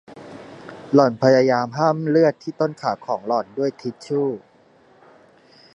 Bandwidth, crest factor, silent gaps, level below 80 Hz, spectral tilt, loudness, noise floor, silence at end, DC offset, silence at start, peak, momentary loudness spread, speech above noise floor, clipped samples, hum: 8.4 kHz; 20 dB; none; -68 dBFS; -7 dB/octave; -20 LUFS; -54 dBFS; 1.4 s; under 0.1%; 0.1 s; -2 dBFS; 23 LU; 34 dB; under 0.1%; none